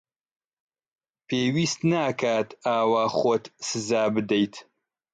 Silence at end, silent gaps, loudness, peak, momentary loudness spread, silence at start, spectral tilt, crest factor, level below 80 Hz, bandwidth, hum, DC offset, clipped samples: 0.5 s; none; -25 LUFS; -10 dBFS; 6 LU; 1.3 s; -5 dB/octave; 16 dB; -68 dBFS; 9.4 kHz; none; under 0.1%; under 0.1%